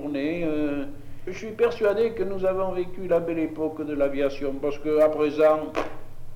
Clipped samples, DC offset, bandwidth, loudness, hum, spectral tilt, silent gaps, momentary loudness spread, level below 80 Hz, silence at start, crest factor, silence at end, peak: under 0.1%; under 0.1%; 15.5 kHz; -25 LUFS; none; -7 dB/octave; none; 14 LU; -42 dBFS; 0 s; 16 dB; 0 s; -8 dBFS